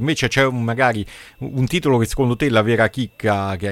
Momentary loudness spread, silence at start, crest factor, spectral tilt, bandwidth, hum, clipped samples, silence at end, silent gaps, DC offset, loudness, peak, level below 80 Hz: 9 LU; 0 s; 16 dB; -5.5 dB/octave; 16 kHz; none; under 0.1%; 0 s; none; under 0.1%; -19 LUFS; -2 dBFS; -40 dBFS